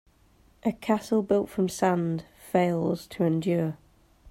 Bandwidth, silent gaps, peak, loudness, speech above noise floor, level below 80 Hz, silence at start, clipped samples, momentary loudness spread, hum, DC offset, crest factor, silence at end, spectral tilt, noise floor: 16 kHz; none; -10 dBFS; -27 LUFS; 35 dB; -60 dBFS; 0.65 s; under 0.1%; 7 LU; none; under 0.1%; 18 dB; 0 s; -7 dB/octave; -60 dBFS